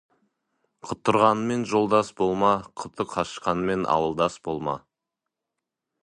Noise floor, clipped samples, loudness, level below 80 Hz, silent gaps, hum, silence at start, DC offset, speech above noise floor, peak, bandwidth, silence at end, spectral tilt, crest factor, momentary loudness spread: -85 dBFS; under 0.1%; -24 LUFS; -58 dBFS; none; none; 0.85 s; under 0.1%; 61 dB; -4 dBFS; 11 kHz; 1.25 s; -5.5 dB/octave; 22 dB; 12 LU